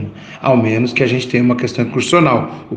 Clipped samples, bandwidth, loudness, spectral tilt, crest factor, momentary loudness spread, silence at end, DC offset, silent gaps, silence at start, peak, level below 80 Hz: under 0.1%; 9.4 kHz; -14 LUFS; -6 dB/octave; 14 dB; 6 LU; 0 s; under 0.1%; none; 0 s; 0 dBFS; -52 dBFS